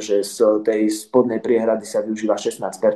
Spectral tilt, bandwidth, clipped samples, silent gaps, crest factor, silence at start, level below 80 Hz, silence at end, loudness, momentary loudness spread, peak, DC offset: -4.5 dB/octave; 12.5 kHz; under 0.1%; none; 16 dB; 0 s; -68 dBFS; 0 s; -20 LUFS; 5 LU; -2 dBFS; under 0.1%